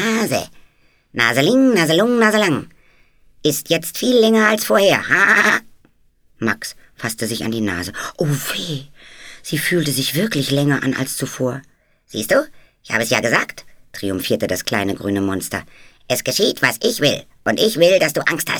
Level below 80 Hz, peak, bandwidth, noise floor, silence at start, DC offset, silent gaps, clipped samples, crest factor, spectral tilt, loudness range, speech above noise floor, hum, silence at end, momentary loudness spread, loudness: -54 dBFS; 0 dBFS; over 20 kHz; -55 dBFS; 0 s; under 0.1%; none; under 0.1%; 18 dB; -4 dB/octave; 6 LU; 38 dB; none; 0 s; 13 LU; -17 LUFS